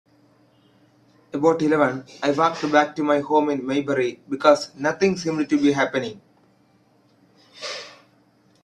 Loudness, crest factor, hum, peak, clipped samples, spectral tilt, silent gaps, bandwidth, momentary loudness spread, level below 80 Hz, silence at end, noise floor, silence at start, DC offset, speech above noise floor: -21 LUFS; 22 dB; none; -2 dBFS; under 0.1%; -5.5 dB/octave; none; 10 kHz; 14 LU; -66 dBFS; 0.75 s; -59 dBFS; 1.35 s; under 0.1%; 39 dB